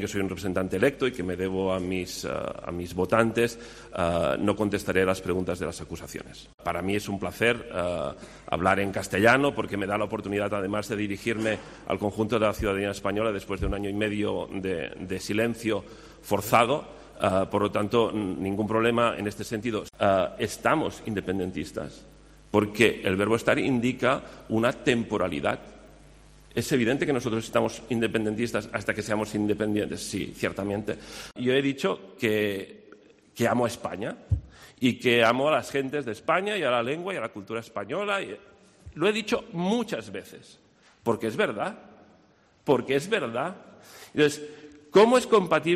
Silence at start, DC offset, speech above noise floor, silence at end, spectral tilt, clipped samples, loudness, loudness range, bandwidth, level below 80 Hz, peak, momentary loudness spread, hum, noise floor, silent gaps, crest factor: 0 s; under 0.1%; 34 dB; 0 s; -5 dB/octave; under 0.1%; -27 LUFS; 4 LU; 15.5 kHz; -50 dBFS; -4 dBFS; 12 LU; none; -60 dBFS; 6.54-6.58 s; 24 dB